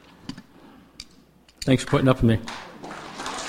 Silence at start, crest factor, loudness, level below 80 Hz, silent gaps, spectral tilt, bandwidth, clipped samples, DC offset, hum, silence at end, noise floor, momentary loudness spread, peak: 0.25 s; 24 dB; -22 LUFS; -42 dBFS; none; -6 dB/octave; 15.5 kHz; under 0.1%; under 0.1%; none; 0 s; -54 dBFS; 24 LU; -2 dBFS